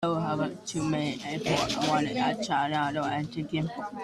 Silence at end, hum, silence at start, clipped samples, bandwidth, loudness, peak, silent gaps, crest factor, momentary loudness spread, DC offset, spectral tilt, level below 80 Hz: 0 s; none; 0 s; under 0.1%; 13.5 kHz; -29 LUFS; -12 dBFS; none; 16 dB; 6 LU; under 0.1%; -5 dB/octave; -58 dBFS